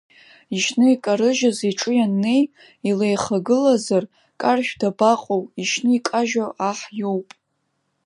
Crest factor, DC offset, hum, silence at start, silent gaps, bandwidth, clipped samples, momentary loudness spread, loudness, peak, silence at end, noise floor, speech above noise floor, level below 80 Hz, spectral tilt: 18 dB; under 0.1%; none; 0.5 s; none; 11.5 kHz; under 0.1%; 8 LU; -20 LUFS; -4 dBFS; 0.85 s; -72 dBFS; 52 dB; -66 dBFS; -4.5 dB/octave